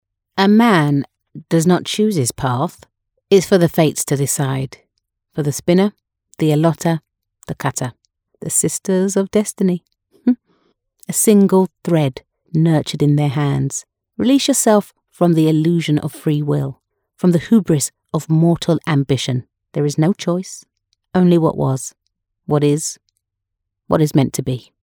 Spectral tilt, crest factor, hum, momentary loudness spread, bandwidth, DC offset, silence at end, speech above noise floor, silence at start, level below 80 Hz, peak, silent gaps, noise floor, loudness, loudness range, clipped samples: -5.5 dB/octave; 16 dB; none; 12 LU; over 20 kHz; under 0.1%; 0.2 s; 63 dB; 0.35 s; -52 dBFS; 0 dBFS; none; -78 dBFS; -17 LUFS; 3 LU; under 0.1%